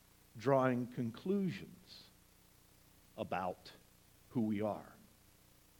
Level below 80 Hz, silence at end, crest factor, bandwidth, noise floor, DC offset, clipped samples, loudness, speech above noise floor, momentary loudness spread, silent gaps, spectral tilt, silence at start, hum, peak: -72 dBFS; 0.85 s; 22 dB; 19 kHz; -66 dBFS; under 0.1%; under 0.1%; -38 LUFS; 29 dB; 24 LU; none; -7.5 dB/octave; 0.35 s; none; -18 dBFS